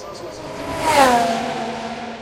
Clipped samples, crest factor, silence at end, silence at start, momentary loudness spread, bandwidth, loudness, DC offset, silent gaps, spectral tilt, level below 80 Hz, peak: under 0.1%; 20 dB; 0 s; 0 s; 18 LU; 16.5 kHz; -18 LUFS; under 0.1%; none; -3.5 dB/octave; -46 dBFS; 0 dBFS